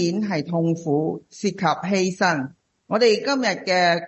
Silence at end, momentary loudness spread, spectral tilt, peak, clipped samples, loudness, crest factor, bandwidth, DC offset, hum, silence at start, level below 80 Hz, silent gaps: 0 s; 9 LU; -5 dB/octave; -4 dBFS; under 0.1%; -22 LUFS; 16 dB; 8.4 kHz; under 0.1%; none; 0 s; -66 dBFS; none